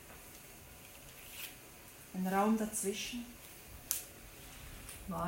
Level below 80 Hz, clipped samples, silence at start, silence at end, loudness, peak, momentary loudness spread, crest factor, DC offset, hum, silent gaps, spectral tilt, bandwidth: -60 dBFS; under 0.1%; 0 s; 0 s; -38 LUFS; -12 dBFS; 19 LU; 30 dB; under 0.1%; none; none; -4 dB/octave; 16.5 kHz